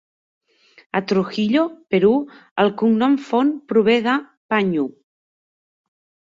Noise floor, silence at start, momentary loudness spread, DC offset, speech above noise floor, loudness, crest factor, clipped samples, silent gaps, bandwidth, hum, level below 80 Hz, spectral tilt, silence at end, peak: under -90 dBFS; 0.95 s; 8 LU; under 0.1%; over 72 dB; -19 LUFS; 16 dB; under 0.1%; 2.51-2.56 s, 4.37-4.49 s; 7.6 kHz; none; -64 dBFS; -7 dB/octave; 1.45 s; -4 dBFS